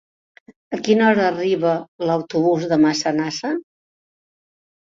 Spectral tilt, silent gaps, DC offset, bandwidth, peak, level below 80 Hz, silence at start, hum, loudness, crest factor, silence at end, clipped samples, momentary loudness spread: -5 dB/octave; 1.88-1.99 s; under 0.1%; 7.8 kHz; -4 dBFS; -64 dBFS; 0.7 s; none; -19 LUFS; 18 dB; 1.25 s; under 0.1%; 10 LU